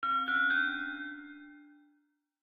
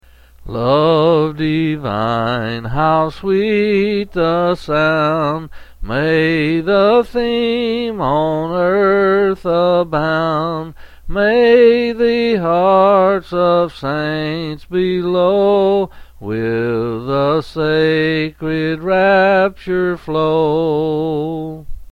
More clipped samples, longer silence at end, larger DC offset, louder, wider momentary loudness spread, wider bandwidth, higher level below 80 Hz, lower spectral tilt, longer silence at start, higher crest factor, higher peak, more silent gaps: neither; first, 0.75 s vs 0 s; neither; second, -30 LUFS vs -15 LUFS; first, 21 LU vs 9 LU; first, 15.5 kHz vs 9.4 kHz; second, -76 dBFS vs -38 dBFS; second, -3.5 dB/octave vs -7.5 dB/octave; second, 0 s vs 0.4 s; about the same, 14 dB vs 14 dB; second, -20 dBFS vs 0 dBFS; neither